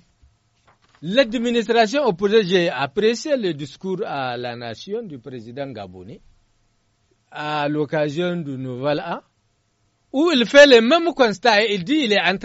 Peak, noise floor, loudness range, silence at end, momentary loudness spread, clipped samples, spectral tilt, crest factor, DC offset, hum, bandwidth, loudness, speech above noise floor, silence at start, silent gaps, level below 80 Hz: 0 dBFS; -66 dBFS; 14 LU; 0 s; 18 LU; under 0.1%; -2.5 dB/octave; 20 dB; under 0.1%; none; 8 kHz; -18 LUFS; 47 dB; 1 s; none; -58 dBFS